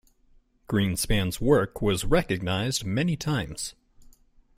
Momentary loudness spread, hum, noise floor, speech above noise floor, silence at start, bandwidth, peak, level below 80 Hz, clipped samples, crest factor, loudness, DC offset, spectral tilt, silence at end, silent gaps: 6 LU; none; -60 dBFS; 35 dB; 0.7 s; 16 kHz; -8 dBFS; -40 dBFS; under 0.1%; 18 dB; -26 LUFS; under 0.1%; -5 dB/octave; 0.85 s; none